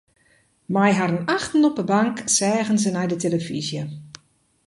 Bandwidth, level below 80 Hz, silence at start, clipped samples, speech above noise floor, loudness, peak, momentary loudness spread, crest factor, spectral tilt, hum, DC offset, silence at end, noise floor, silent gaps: 11.5 kHz; -60 dBFS; 0.7 s; under 0.1%; 40 dB; -21 LUFS; -4 dBFS; 9 LU; 18 dB; -4.5 dB/octave; none; under 0.1%; 0.6 s; -61 dBFS; none